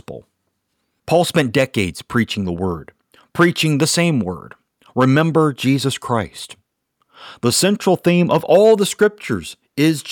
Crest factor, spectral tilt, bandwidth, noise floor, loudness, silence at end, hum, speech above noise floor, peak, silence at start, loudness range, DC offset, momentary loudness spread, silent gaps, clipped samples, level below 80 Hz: 14 dB; -5 dB/octave; 19 kHz; -71 dBFS; -17 LUFS; 0 s; none; 54 dB; -2 dBFS; 0.1 s; 3 LU; under 0.1%; 15 LU; none; under 0.1%; -52 dBFS